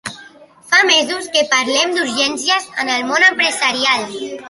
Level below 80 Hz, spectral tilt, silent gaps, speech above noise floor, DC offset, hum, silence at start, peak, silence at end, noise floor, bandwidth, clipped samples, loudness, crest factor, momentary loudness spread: -64 dBFS; -0.5 dB/octave; none; 26 dB; under 0.1%; none; 0.05 s; 0 dBFS; 0 s; -42 dBFS; 11.5 kHz; under 0.1%; -14 LUFS; 16 dB; 7 LU